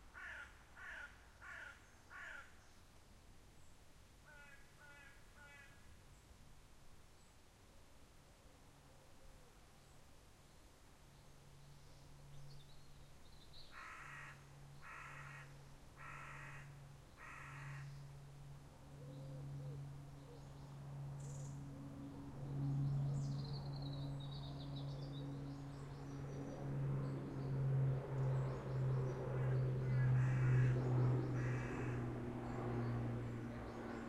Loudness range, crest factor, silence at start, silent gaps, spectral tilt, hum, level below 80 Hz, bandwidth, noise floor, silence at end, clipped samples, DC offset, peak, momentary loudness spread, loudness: 26 LU; 18 dB; 0 s; none; -7.5 dB/octave; none; -62 dBFS; 11 kHz; -65 dBFS; 0 s; under 0.1%; under 0.1%; -26 dBFS; 26 LU; -44 LUFS